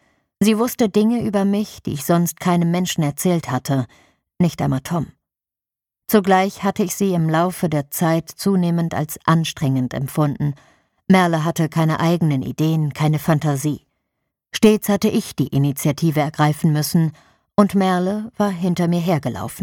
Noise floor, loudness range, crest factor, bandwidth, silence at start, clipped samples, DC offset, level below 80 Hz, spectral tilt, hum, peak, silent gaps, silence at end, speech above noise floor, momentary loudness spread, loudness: -89 dBFS; 2 LU; 18 dB; 18 kHz; 0.4 s; under 0.1%; under 0.1%; -52 dBFS; -6 dB/octave; none; 0 dBFS; none; 0 s; 71 dB; 7 LU; -19 LUFS